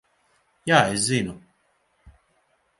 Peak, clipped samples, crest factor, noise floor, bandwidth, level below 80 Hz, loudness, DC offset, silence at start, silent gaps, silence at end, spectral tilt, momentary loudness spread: 0 dBFS; under 0.1%; 26 dB; -67 dBFS; 11.5 kHz; -58 dBFS; -22 LUFS; under 0.1%; 0.65 s; none; 0.7 s; -3.5 dB/octave; 15 LU